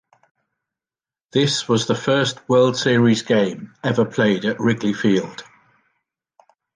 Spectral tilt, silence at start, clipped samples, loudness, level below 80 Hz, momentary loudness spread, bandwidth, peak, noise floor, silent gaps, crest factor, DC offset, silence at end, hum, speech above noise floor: -5 dB/octave; 1.35 s; under 0.1%; -19 LUFS; -60 dBFS; 7 LU; 9.8 kHz; -4 dBFS; under -90 dBFS; none; 16 dB; under 0.1%; 1.35 s; none; over 72 dB